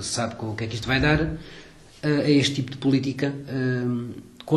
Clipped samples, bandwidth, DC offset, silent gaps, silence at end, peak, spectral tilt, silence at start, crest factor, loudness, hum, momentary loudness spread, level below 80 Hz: under 0.1%; 12 kHz; under 0.1%; none; 0 s; -6 dBFS; -5.5 dB/octave; 0 s; 18 dB; -24 LUFS; none; 11 LU; -44 dBFS